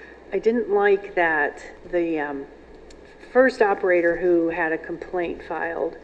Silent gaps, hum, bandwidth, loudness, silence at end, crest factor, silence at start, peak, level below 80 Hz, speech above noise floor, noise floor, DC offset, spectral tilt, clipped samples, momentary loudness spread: none; none; 8.8 kHz; -22 LUFS; 0.05 s; 18 dB; 0 s; -4 dBFS; -50 dBFS; 23 dB; -45 dBFS; under 0.1%; -6.5 dB/octave; under 0.1%; 10 LU